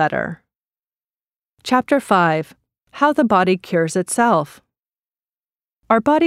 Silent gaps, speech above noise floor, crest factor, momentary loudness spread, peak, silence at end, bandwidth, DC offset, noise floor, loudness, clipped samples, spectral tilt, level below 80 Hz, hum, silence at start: 1.38-1.42 s, 4.79-4.83 s, 4.99-5.04 s; over 73 dB; 18 dB; 15 LU; 0 dBFS; 0 s; 15.5 kHz; under 0.1%; under -90 dBFS; -17 LUFS; under 0.1%; -5 dB/octave; -60 dBFS; none; 0 s